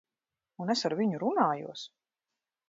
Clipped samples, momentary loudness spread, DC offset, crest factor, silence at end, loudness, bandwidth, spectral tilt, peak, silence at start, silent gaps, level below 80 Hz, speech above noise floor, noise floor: under 0.1%; 15 LU; under 0.1%; 22 dB; 0.8 s; -30 LUFS; 7.8 kHz; -5 dB/octave; -12 dBFS; 0.6 s; none; -82 dBFS; over 60 dB; under -90 dBFS